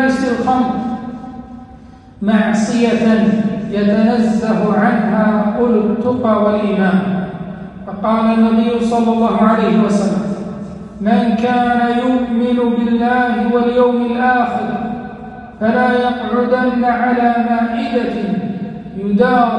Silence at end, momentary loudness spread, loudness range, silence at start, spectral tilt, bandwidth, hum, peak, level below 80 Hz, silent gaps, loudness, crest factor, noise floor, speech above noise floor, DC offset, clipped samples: 0 s; 13 LU; 2 LU; 0 s; -7 dB/octave; 9.4 kHz; none; -2 dBFS; -44 dBFS; none; -15 LUFS; 12 dB; -38 dBFS; 24 dB; under 0.1%; under 0.1%